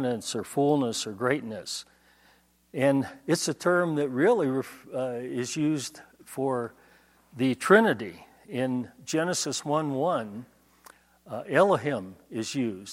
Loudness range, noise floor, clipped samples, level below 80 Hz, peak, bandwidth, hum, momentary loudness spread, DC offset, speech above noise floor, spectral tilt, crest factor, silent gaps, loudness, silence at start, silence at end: 4 LU; -62 dBFS; under 0.1%; -72 dBFS; -4 dBFS; 16.5 kHz; none; 14 LU; under 0.1%; 36 dB; -4.5 dB/octave; 24 dB; none; -27 LUFS; 0 s; 0 s